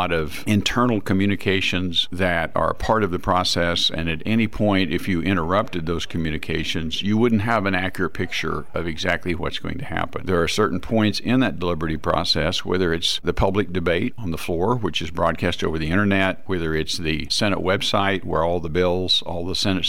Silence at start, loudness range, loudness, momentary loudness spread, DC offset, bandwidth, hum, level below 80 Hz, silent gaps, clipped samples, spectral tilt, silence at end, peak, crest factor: 0 s; 2 LU; -22 LUFS; 6 LU; 3%; 16.5 kHz; none; -40 dBFS; none; under 0.1%; -5 dB/octave; 0 s; -6 dBFS; 16 dB